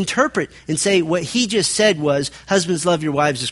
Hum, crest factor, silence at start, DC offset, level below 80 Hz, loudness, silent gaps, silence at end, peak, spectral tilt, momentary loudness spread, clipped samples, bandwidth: none; 18 dB; 0 s; under 0.1%; -52 dBFS; -18 LUFS; none; 0 s; 0 dBFS; -3.5 dB/octave; 5 LU; under 0.1%; 11.5 kHz